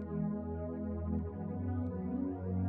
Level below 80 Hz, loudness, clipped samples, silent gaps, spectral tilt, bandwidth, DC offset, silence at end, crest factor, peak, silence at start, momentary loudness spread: -50 dBFS; -38 LUFS; under 0.1%; none; -12.5 dB/octave; 2.6 kHz; under 0.1%; 0 s; 10 dB; -26 dBFS; 0 s; 2 LU